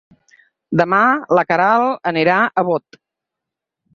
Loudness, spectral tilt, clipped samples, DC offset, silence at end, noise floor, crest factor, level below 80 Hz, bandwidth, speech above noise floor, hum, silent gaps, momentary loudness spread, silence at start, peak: -16 LUFS; -7 dB/octave; under 0.1%; under 0.1%; 1.15 s; -83 dBFS; 16 dB; -62 dBFS; 7.2 kHz; 68 dB; none; none; 6 LU; 0.7 s; -2 dBFS